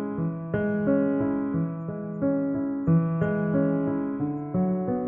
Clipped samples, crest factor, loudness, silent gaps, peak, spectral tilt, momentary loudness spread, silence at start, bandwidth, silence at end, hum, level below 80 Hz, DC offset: under 0.1%; 14 dB; -26 LUFS; none; -12 dBFS; -13 dB/octave; 6 LU; 0 s; 3.4 kHz; 0 s; none; -58 dBFS; under 0.1%